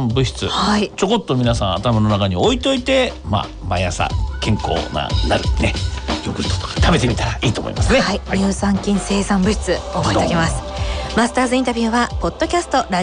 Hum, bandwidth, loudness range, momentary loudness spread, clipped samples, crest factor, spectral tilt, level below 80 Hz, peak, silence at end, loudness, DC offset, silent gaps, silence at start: none; 10.5 kHz; 2 LU; 5 LU; under 0.1%; 14 dB; -5 dB/octave; -28 dBFS; -4 dBFS; 0 s; -18 LUFS; under 0.1%; none; 0 s